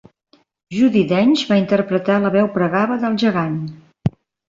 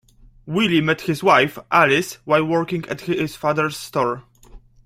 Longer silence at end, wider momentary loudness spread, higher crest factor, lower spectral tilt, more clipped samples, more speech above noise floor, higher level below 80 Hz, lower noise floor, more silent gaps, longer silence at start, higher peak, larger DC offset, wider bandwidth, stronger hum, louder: about the same, 0.4 s vs 0.3 s; about the same, 10 LU vs 10 LU; about the same, 14 dB vs 18 dB; first, -7 dB/octave vs -5 dB/octave; neither; first, 42 dB vs 26 dB; about the same, -52 dBFS vs -52 dBFS; first, -58 dBFS vs -45 dBFS; neither; first, 0.7 s vs 0.45 s; about the same, -4 dBFS vs -2 dBFS; neither; second, 7.6 kHz vs 16 kHz; neither; about the same, -17 LUFS vs -19 LUFS